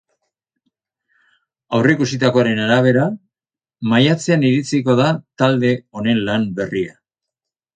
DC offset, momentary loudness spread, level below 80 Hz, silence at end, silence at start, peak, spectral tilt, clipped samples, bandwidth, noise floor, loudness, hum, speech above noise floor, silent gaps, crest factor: under 0.1%; 8 LU; -56 dBFS; 0.85 s; 1.7 s; 0 dBFS; -6 dB/octave; under 0.1%; 9.4 kHz; under -90 dBFS; -17 LUFS; none; over 74 dB; none; 18 dB